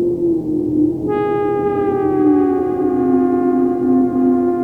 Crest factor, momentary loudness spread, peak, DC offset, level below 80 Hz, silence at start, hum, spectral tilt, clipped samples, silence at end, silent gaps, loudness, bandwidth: 12 dB; 4 LU; -4 dBFS; under 0.1%; -48 dBFS; 0 s; none; -10 dB/octave; under 0.1%; 0 s; none; -16 LUFS; 3.5 kHz